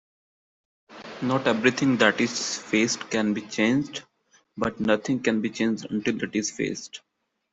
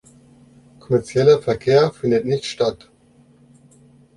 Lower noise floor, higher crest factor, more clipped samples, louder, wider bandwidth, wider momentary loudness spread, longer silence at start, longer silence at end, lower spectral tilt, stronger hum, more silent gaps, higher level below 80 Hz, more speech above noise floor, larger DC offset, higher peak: first, -64 dBFS vs -53 dBFS; about the same, 22 dB vs 18 dB; neither; second, -25 LUFS vs -18 LUFS; second, 8.2 kHz vs 11 kHz; first, 15 LU vs 8 LU; about the same, 0.9 s vs 0.9 s; second, 0.55 s vs 1.4 s; second, -4 dB/octave vs -6 dB/octave; neither; neither; second, -64 dBFS vs -54 dBFS; first, 39 dB vs 35 dB; neither; about the same, -4 dBFS vs -2 dBFS